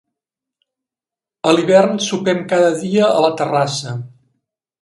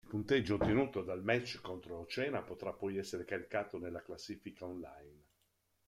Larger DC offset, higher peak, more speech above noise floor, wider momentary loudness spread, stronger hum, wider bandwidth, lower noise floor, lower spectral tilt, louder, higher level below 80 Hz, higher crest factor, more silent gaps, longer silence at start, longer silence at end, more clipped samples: neither; first, 0 dBFS vs -18 dBFS; first, 74 dB vs 40 dB; second, 9 LU vs 14 LU; neither; second, 11.5 kHz vs 14.5 kHz; first, -89 dBFS vs -79 dBFS; about the same, -5 dB/octave vs -6 dB/octave; first, -15 LUFS vs -39 LUFS; about the same, -64 dBFS vs -62 dBFS; about the same, 18 dB vs 20 dB; neither; first, 1.45 s vs 0.05 s; about the same, 0.75 s vs 0.7 s; neither